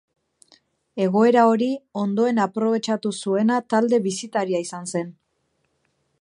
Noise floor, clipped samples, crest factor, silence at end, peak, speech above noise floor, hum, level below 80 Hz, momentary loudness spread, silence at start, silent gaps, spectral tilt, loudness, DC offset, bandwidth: -71 dBFS; under 0.1%; 18 dB; 1.1 s; -4 dBFS; 50 dB; none; -74 dBFS; 11 LU; 0.95 s; none; -5.5 dB/octave; -21 LUFS; under 0.1%; 11 kHz